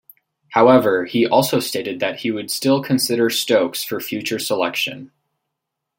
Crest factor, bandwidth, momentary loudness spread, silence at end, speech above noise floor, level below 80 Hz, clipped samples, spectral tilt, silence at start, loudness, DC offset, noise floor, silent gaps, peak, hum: 18 dB; 17 kHz; 10 LU; 0.9 s; 62 dB; -64 dBFS; under 0.1%; -4 dB/octave; 0.5 s; -18 LUFS; under 0.1%; -80 dBFS; none; -2 dBFS; none